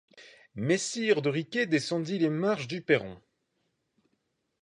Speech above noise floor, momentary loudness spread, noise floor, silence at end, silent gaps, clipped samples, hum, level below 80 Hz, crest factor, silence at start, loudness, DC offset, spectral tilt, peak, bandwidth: 49 dB; 6 LU; -78 dBFS; 1.45 s; none; under 0.1%; none; -70 dBFS; 22 dB; 0.15 s; -29 LUFS; under 0.1%; -5 dB/octave; -10 dBFS; 11.5 kHz